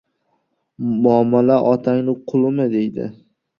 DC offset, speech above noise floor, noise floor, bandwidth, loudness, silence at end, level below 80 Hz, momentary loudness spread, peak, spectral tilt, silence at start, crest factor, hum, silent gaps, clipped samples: under 0.1%; 52 dB; -68 dBFS; 5.8 kHz; -17 LUFS; 0.45 s; -60 dBFS; 11 LU; -2 dBFS; -10 dB/octave; 0.8 s; 16 dB; none; none; under 0.1%